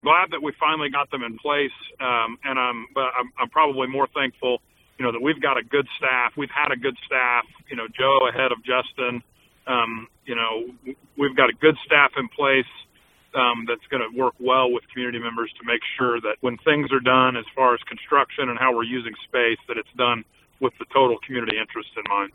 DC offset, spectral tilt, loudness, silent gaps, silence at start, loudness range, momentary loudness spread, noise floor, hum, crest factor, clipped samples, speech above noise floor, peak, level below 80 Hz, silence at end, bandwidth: under 0.1%; -6.5 dB/octave; -22 LUFS; none; 0.05 s; 3 LU; 10 LU; -57 dBFS; none; 22 dB; under 0.1%; 34 dB; 0 dBFS; -64 dBFS; 0.05 s; 4.4 kHz